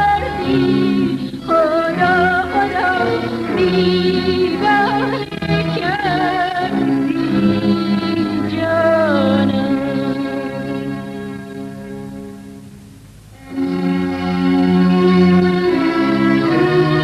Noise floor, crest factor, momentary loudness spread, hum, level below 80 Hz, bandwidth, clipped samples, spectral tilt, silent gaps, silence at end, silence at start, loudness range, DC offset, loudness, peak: -39 dBFS; 12 dB; 13 LU; none; -42 dBFS; 13 kHz; under 0.1%; -7.5 dB/octave; none; 0 s; 0 s; 9 LU; under 0.1%; -16 LUFS; -4 dBFS